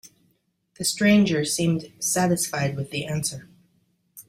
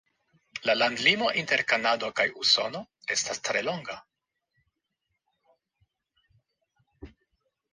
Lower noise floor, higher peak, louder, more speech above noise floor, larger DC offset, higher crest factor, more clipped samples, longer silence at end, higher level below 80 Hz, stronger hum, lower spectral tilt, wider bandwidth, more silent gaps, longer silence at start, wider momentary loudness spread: second, -69 dBFS vs -82 dBFS; about the same, -6 dBFS vs -6 dBFS; about the same, -23 LUFS vs -25 LUFS; second, 46 dB vs 55 dB; neither; second, 18 dB vs 24 dB; neither; second, 0.05 s vs 0.65 s; first, -60 dBFS vs -66 dBFS; neither; first, -4.5 dB/octave vs -1.5 dB/octave; first, 16 kHz vs 10.5 kHz; neither; second, 0.05 s vs 0.55 s; second, 10 LU vs 14 LU